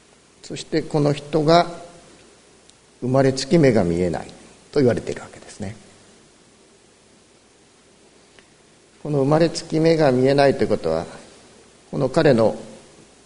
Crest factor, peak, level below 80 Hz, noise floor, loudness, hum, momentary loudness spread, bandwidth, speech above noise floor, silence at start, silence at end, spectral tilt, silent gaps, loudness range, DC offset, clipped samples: 20 dB; 0 dBFS; -50 dBFS; -53 dBFS; -19 LUFS; none; 18 LU; 11 kHz; 35 dB; 0.45 s; 0.5 s; -6.5 dB/octave; none; 8 LU; under 0.1%; under 0.1%